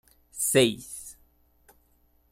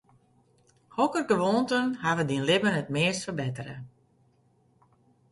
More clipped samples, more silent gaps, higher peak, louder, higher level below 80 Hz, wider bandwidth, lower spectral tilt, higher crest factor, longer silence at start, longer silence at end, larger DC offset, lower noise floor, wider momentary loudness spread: neither; neither; first, -6 dBFS vs -10 dBFS; first, -24 LUFS vs -27 LUFS; about the same, -62 dBFS vs -66 dBFS; first, 16 kHz vs 11.5 kHz; second, -3 dB/octave vs -5 dB/octave; about the same, 24 dB vs 20 dB; second, 0.35 s vs 0.95 s; second, 1.2 s vs 1.45 s; neither; about the same, -65 dBFS vs -66 dBFS; first, 22 LU vs 14 LU